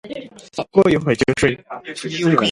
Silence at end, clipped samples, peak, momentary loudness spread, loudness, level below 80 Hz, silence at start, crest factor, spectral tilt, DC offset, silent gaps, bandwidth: 0 s; under 0.1%; 0 dBFS; 16 LU; -18 LUFS; -46 dBFS; 0.05 s; 18 dB; -5.5 dB/octave; under 0.1%; none; 11.5 kHz